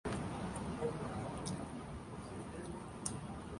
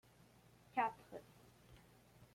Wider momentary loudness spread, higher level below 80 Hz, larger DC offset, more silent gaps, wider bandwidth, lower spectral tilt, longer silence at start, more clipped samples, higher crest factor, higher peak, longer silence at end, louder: second, 7 LU vs 26 LU; first, -56 dBFS vs -76 dBFS; neither; neither; second, 11.5 kHz vs 16.5 kHz; about the same, -5.5 dB/octave vs -5 dB/octave; second, 0.05 s vs 0.75 s; neither; about the same, 24 dB vs 22 dB; first, -20 dBFS vs -26 dBFS; about the same, 0 s vs 0.1 s; about the same, -44 LUFS vs -44 LUFS